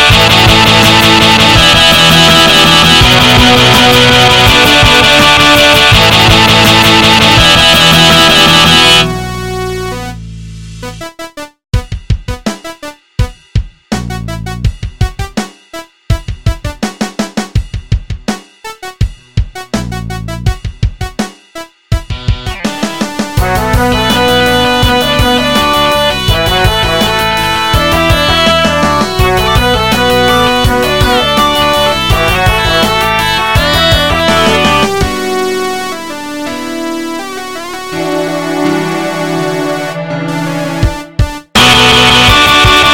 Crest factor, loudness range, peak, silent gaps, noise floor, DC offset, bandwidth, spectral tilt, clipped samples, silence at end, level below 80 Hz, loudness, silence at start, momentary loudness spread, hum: 8 dB; 15 LU; 0 dBFS; none; -29 dBFS; 2%; over 20 kHz; -3.5 dB/octave; 1%; 0 s; -22 dBFS; -7 LUFS; 0 s; 16 LU; none